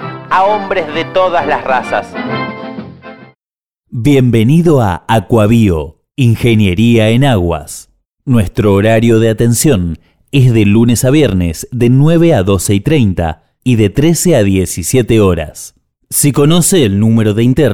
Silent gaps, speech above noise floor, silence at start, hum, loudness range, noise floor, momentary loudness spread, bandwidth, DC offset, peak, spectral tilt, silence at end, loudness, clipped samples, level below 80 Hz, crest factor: 3.37-3.41 s, 3.58-3.66 s; over 80 dB; 0 s; none; 4 LU; under -90 dBFS; 11 LU; 18 kHz; under 0.1%; 0 dBFS; -6 dB/octave; 0 s; -11 LUFS; under 0.1%; -32 dBFS; 10 dB